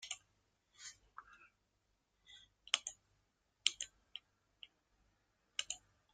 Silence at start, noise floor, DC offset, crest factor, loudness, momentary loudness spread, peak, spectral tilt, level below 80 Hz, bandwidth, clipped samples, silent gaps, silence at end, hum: 0 s; -82 dBFS; under 0.1%; 40 dB; -42 LUFS; 23 LU; -10 dBFS; 3 dB/octave; -82 dBFS; 13.5 kHz; under 0.1%; none; 0.35 s; none